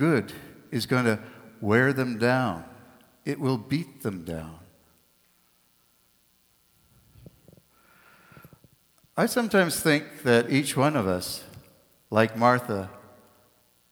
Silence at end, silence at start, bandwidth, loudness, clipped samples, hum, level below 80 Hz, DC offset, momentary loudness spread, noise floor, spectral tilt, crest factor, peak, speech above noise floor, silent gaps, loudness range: 0.9 s; 0 s; over 20 kHz; -26 LUFS; under 0.1%; none; -62 dBFS; under 0.1%; 16 LU; -65 dBFS; -5.5 dB/octave; 22 dB; -6 dBFS; 40 dB; none; 12 LU